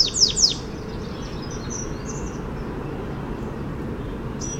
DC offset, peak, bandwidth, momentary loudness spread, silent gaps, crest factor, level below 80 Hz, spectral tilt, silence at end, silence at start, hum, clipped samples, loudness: under 0.1%; -4 dBFS; 16.5 kHz; 15 LU; none; 22 dB; -36 dBFS; -3 dB/octave; 0 s; 0 s; none; under 0.1%; -25 LUFS